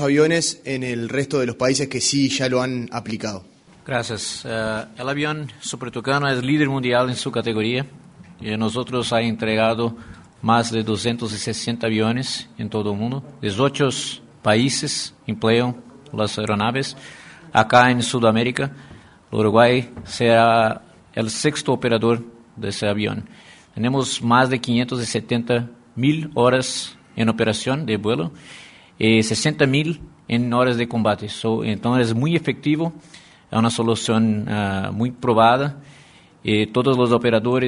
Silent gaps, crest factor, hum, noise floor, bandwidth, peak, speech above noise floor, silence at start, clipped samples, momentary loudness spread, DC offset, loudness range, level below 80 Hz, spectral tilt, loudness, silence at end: none; 20 dB; none; -49 dBFS; 11 kHz; 0 dBFS; 29 dB; 0 s; under 0.1%; 12 LU; under 0.1%; 4 LU; -54 dBFS; -5 dB/octave; -20 LUFS; 0 s